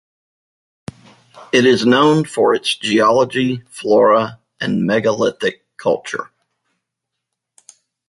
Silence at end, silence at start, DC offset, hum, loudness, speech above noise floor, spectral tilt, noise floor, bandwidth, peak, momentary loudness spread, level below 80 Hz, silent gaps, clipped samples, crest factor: 1.85 s; 1.35 s; under 0.1%; none; -16 LUFS; 64 dB; -5 dB/octave; -79 dBFS; 11.5 kHz; -2 dBFS; 14 LU; -58 dBFS; none; under 0.1%; 16 dB